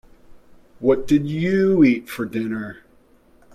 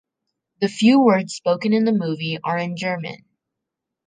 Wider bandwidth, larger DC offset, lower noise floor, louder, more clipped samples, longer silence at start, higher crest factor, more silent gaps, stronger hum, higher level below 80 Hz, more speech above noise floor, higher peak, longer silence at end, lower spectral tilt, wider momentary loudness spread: first, 15 kHz vs 9.6 kHz; neither; second, -54 dBFS vs -83 dBFS; about the same, -20 LUFS vs -20 LUFS; neither; second, 0.3 s vs 0.6 s; about the same, 16 dB vs 18 dB; neither; neither; first, -50 dBFS vs -70 dBFS; second, 35 dB vs 64 dB; about the same, -4 dBFS vs -2 dBFS; about the same, 0.8 s vs 0.9 s; first, -7.5 dB/octave vs -6 dB/octave; about the same, 12 LU vs 11 LU